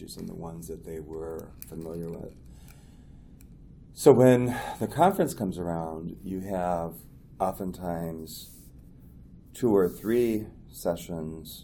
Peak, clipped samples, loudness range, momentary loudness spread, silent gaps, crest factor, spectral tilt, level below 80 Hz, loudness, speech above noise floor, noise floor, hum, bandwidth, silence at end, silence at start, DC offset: -4 dBFS; under 0.1%; 15 LU; 19 LU; none; 24 dB; -6.5 dB/octave; -52 dBFS; -27 LUFS; 22 dB; -50 dBFS; none; over 20 kHz; 0 s; 0 s; under 0.1%